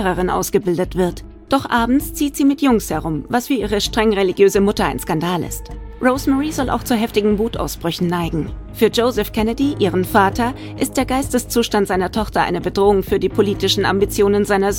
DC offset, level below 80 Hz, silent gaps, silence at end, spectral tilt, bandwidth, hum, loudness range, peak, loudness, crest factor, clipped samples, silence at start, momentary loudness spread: under 0.1%; -34 dBFS; none; 0 s; -5 dB/octave; 17.5 kHz; none; 2 LU; 0 dBFS; -18 LUFS; 18 dB; under 0.1%; 0 s; 7 LU